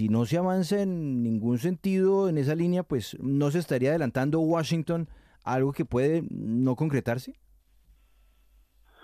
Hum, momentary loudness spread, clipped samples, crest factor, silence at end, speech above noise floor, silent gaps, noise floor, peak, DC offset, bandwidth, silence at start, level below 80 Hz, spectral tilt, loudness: none; 6 LU; under 0.1%; 14 dB; 1.7 s; 35 dB; none; -61 dBFS; -14 dBFS; under 0.1%; 15 kHz; 0 s; -58 dBFS; -7.5 dB/octave; -27 LUFS